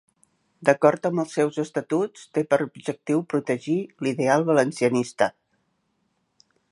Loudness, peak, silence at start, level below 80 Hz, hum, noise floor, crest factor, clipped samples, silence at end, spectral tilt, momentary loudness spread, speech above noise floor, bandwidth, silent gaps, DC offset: -24 LUFS; -2 dBFS; 0.6 s; -72 dBFS; none; -72 dBFS; 22 dB; under 0.1%; 1.4 s; -6 dB/octave; 8 LU; 49 dB; 11.5 kHz; none; under 0.1%